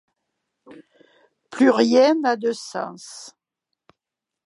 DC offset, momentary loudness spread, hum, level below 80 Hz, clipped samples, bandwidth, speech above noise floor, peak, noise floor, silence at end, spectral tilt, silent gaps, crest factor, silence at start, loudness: under 0.1%; 22 LU; none; -78 dBFS; under 0.1%; 11.5 kHz; 67 dB; -4 dBFS; -86 dBFS; 1.15 s; -4 dB/octave; none; 20 dB; 0.7 s; -19 LUFS